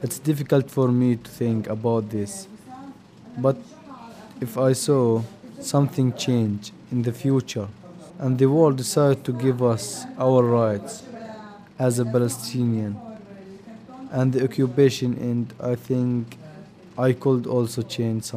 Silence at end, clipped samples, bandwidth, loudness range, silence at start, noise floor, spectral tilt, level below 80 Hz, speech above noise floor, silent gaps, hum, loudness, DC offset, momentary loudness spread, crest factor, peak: 0 s; under 0.1%; 15.5 kHz; 5 LU; 0 s; -44 dBFS; -6.5 dB/octave; -64 dBFS; 22 dB; none; none; -23 LUFS; under 0.1%; 22 LU; 18 dB; -4 dBFS